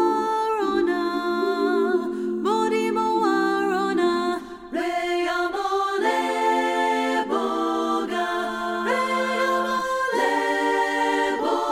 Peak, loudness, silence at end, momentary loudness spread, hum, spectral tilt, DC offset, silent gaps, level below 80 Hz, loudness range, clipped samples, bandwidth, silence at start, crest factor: -8 dBFS; -23 LUFS; 0 s; 4 LU; none; -3.5 dB/octave; under 0.1%; none; -58 dBFS; 1 LU; under 0.1%; 15.5 kHz; 0 s; 14 dB